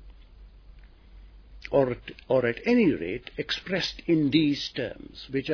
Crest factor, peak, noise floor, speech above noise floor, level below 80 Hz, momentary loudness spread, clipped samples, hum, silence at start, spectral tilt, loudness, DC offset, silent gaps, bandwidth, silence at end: 18 dB; -10 dBFS; -50 dBFS; 24 dB; -50 dBFS; 12 LU; under 0.1%; none; 0 s; -6 dB/octave; -26 LUFS; under 0.1%; none; 5.4 kHz; 0 s